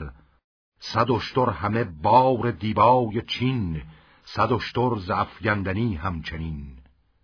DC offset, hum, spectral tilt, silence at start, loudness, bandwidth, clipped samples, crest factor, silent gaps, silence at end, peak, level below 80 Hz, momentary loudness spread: under 0.1%; none; -7.5 dB/octave; 0 s; -23 LUFS; 5.4 kHz; under 0.1%; 20 dB; 0.44-0.72 s; 0.45 s; -4 dBFS; -46 dBFS; 16 LU